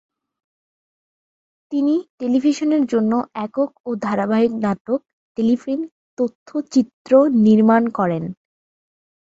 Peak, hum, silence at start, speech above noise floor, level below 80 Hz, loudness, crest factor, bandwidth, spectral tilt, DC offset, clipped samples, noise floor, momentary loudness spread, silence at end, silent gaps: -2 dBFS; none; 1.7 s; over 72 dB; -62 dBFS; -19 LUFS; 16 dB; 7.8 kHz; -7 dB/octave; under 0.1%; under 0.1%; under -90 dBFS; 12 LU; 0.95 s; 2.10-2.18 s, 3.80-3.84 s, 4.80-4.85 s, 5.13-5.35 s, 5.91-6.17 s, 6.35-6.46 s, 6.93-7.05 s